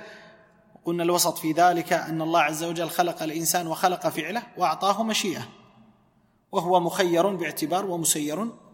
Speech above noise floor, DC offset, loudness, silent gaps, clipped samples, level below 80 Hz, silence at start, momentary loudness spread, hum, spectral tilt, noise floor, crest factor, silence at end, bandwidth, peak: 39 dB; under 0.1%; -24 LUFS; none; under 0.1%; -72 dBFS; 0 s; 9 LU; none; -3.5 dB/octave; -64 dBFS; 20 dB; 0.2 s; 16.5 kHz; -6 dBFS